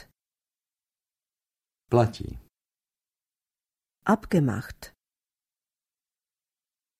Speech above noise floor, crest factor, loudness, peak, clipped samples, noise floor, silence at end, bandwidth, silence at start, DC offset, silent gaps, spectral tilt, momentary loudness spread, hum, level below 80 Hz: over 65 dB; 26 dB; -26 LUFS; -6 dBFS; under 0.1%; under -90 dBFS; 2.1 s; 14.5 kHz; 1.9 s; under 0.1%; none; -7.5 dB/octave; 19 LU; none; -54 dBFS